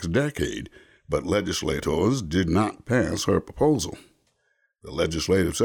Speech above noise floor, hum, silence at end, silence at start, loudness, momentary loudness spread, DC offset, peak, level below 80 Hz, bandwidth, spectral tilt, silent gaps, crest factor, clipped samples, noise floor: 47 dB; none; 0 s; 0 s; -25 LUFS; 9 LU; under 0.1%; -10 dBFS; -44 dBFS; 19 kHz; -5 dB/octave; none; 14 dB; under 0.1%; -71 dBFS